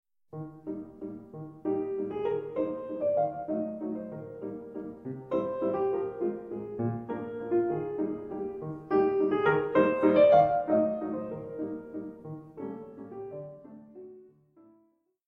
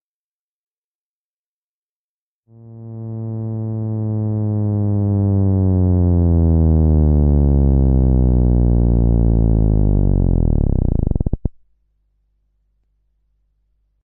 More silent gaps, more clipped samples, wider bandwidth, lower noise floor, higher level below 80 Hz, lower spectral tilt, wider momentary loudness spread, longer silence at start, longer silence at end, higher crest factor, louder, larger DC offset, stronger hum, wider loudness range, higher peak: neither; neither; first, 5.4 kHz vs 1.8 kHz; second, -69 dBFS vs under -90 dBFS; second, -66 dBFS vs -20 dBFS; second, -9.5 dB/octave vs -16.5 dB/octave; first, 18 LU vs 11 LU; second, 0.35 s vs 2.65 s; second, 1 s vs 2.55 s; first, 20 dB vs 14 dB; second, -30 LUFS vs -17 LUFS; neither; neither; about the same, 14 LU vs 13 LU; second, -10 dBFS vs -4 dBFS